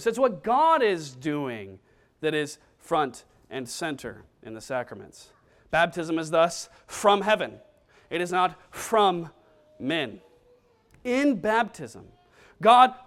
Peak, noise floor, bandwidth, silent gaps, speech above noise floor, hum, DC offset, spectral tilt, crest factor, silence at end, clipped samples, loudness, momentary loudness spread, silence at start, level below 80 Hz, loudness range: -4 dBFS; -61 dBFS; 15.5 kHz; none; 36 dB; none; under 0.1%; -4 dB/octave; 22 dB; 0.1 s; under 0.1%; -25 LUFS; 19 LU; 0 s; -64 dBFS; 6 LU